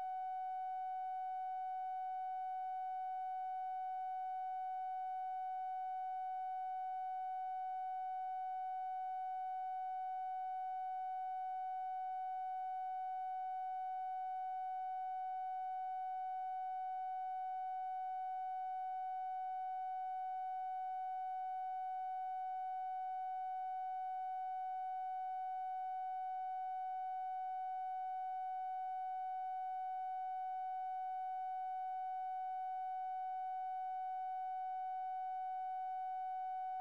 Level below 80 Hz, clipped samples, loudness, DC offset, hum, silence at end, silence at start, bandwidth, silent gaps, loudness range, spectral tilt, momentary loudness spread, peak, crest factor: under -90 dBFS; under 0.1%; -43 LUFS; under 0.1%; none; 0 s; 0 s; 4.7 kHz; none; 0 LU; -1 dB/octave; 0 LU; -38 dBFS; 4 dB